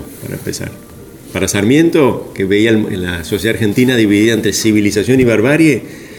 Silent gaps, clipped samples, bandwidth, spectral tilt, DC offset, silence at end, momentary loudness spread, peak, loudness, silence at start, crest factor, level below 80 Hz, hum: none; under 0.1%; 18.5 kHz; -5 dB/octave; under 0.1%; 0 s; 12 LU; 0 dBFS; -12 LUFS; 0 s; 12 dB; -42 dBFS; none